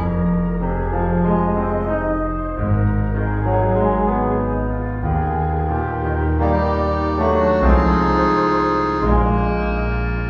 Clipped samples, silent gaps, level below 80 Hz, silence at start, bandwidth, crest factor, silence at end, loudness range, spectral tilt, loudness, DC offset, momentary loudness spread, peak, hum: under 0.1%; none; -24 dBFS; 0 s; 6.6 kHz; 16 dB; 0 s; 3 LU; -9.5 dB/octave; -19 LUFS; under 0.1%; 6 LU; -2 dBFS; none